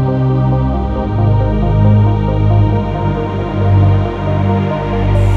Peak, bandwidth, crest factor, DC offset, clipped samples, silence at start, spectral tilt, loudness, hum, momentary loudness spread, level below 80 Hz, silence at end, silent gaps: 0 dBFS; 4.5 kHz; 10 dB; under 0.1%; under 0.1%; 0 s; -9.5 dB/octave; -13 LUFS; none; 6 LU; -20 dBFS; 0 s; none